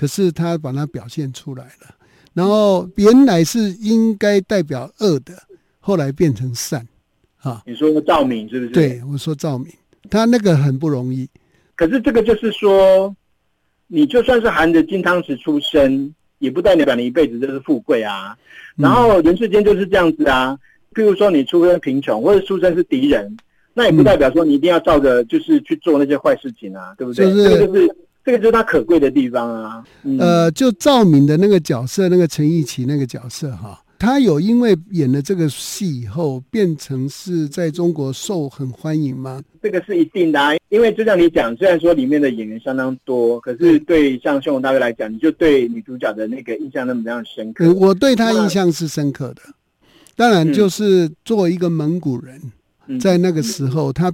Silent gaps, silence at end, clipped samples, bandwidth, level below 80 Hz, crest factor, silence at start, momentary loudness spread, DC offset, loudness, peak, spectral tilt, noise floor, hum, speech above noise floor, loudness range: none; 0 s; under 0.1%; 17 kHz; -44 dBFS; 16 dB; 0 s; 13 LU; under 0.1%; -15 LUFS; 0 dBFS; -6.5 dB/octave; -65 dBFS; none; 50 dB; 5 LU